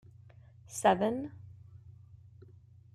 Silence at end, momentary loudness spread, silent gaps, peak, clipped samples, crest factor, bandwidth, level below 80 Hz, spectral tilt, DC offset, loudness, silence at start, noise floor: 1.05 s; 27 LU; none; -14 dBFS; under 0.1%; 22 dB; 15 kHz; -68 dBFS; -5 dB/octave; under 0.1%; -31 LUFS; 0.7 s; -57 dBFS